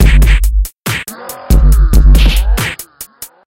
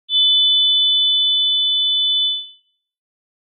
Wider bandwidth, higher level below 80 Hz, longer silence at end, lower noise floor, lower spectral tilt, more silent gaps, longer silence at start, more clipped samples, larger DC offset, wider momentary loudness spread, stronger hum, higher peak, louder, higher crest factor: first, 16.5 kHz vs 3.8 kHz; first, -10 dBFS vs under -90 dBFS; second, 0.2 s vs 0.95 s; second, -32 dBFS vs -53 dBFS; first, -5 dB/octave vs 6.5 dB/octave; neither; about the same, 0 s vs 0.1 s; first, 0.3% vs under 0.1%; neither; first, 18 LU vs 5 LU; neither; first, 0 dBFS vs -8 dBFS; about the same, -12 LUFS vs -13 LUFS; about the same, 8 dB vs 10 dB